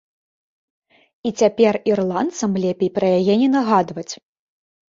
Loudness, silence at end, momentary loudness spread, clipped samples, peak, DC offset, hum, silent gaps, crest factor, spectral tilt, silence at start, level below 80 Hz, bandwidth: -18 LUFS; 0.8 s; 12 LU; under 0.1%; -2 dBFS; under 0.1%; none; none; 18 dB; -6 dB/octave; 1.25 s; -62 dBFS; 7.8 kHz